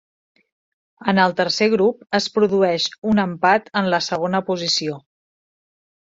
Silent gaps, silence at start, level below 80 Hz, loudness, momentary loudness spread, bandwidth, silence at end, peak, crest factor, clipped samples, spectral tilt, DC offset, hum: 2.98-3.02 s; 1 s; -62 dBFS; -19 LUFS; 5 LU; 7.8 kHz; 1.15 s; 0 dBFS; 20 dB; under 0.1%; -4.5 dB/octave; under 0.1%; none